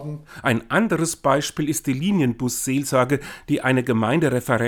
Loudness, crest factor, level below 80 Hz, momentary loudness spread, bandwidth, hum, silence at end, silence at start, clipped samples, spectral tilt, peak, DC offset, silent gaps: -21 LUFS; 18 dB; -52 dBFS; 4 LU; 19 kHz; none; 0 s; 0 s; under 0.1%; -5 dB/octave; -4 dBFS; under 0.1%; none